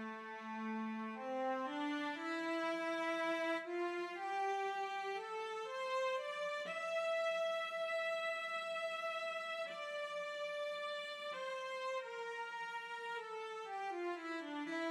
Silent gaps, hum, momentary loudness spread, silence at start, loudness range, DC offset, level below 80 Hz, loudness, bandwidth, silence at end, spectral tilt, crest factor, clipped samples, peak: none; none; 6 LU; 0 s; 4 LU; under 0.1%; under -90 dBFS; -41 LUFS; 14.5 kHz; 0 s; -3 dB/octave; 14 dB; under 0.1%; -28 dBFS